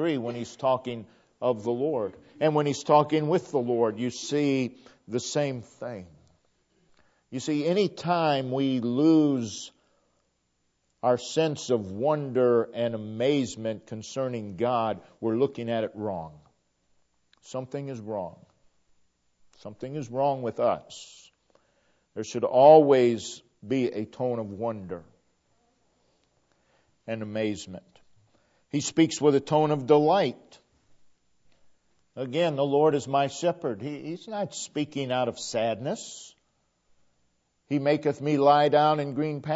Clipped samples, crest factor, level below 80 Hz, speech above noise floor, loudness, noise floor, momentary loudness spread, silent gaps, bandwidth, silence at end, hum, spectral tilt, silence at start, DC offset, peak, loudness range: under 0.1%; 22 dB; -72 dBFS; 48 dB; -26 LUFS; -74 dBFS; 16 LU; none; 8 kHz; 0 s; none; -5.5 dB/octave; 0 s; under 0.1%; -6 dBFS; 12 LU